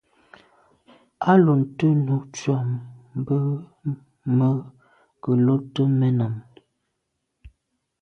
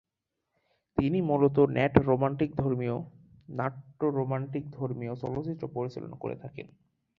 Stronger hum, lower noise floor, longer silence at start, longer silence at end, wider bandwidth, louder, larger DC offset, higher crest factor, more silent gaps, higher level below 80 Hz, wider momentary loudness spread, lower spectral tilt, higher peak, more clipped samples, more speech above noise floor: neither; second, -77 dBFS vs -85 dBFS; first, 1.2 s vs 0.95 s; about the same, 0.55 s vs 0.55 s; first, 7.4 kHz vs 6 kHz; first, -22 LUFS vs -30 LUFS; neither; second, 20 dB vs 28 dB; neither; about the same, -60 dBFS vs -56 dBFS; about the same, 14 LU vs 14 LU; second, -8.5 dB/octave vs -10 dB/octave; about the same, -4 dBFS vs -2 dBFS; neither; about the same, 57 dB vs 56 dB